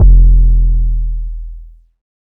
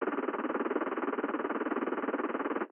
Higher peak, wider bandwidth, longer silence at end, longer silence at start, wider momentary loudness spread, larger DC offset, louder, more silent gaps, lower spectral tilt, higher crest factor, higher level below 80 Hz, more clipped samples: first, 0 dBFS vs -18 dBFS; second, 0.7 kHz vs 3.5 kHz; first, 0.7 s vs 0.05 s; about the same, 0 s vs 0 s; first, 20 LU vs 1 LU; neither; first, -14 LUFS vs -34 LUFS; neither; first, -12 dB/octave vs -3.5 dB/octave; about the same, 10 dB vs 14 dB; first, -10 dBFS vs -78 dBFS; neither